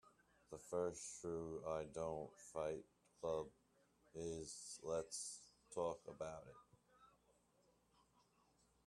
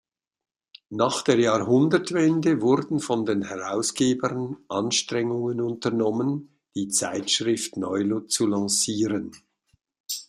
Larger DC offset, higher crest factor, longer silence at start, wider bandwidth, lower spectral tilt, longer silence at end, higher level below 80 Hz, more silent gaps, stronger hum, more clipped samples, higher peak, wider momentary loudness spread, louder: neither; about the same, 20 dB vs 18 dB; second, 0.05 s vs 0.9 s; second, 13.5 kHz vs 15.5 kHz; about the same, -4.5 dB/octave vs -4 dB/octave; first, 1.8 s vs 0.05 s; second, -76 dBFS vs -66 dBFS; second, none vs 10.00-10.04 s; neither; neither; second, -30 dBFS vs -6 dBFS; first, 13 LU vs 8 LU; second, -48 LUFS vs -24 LUFS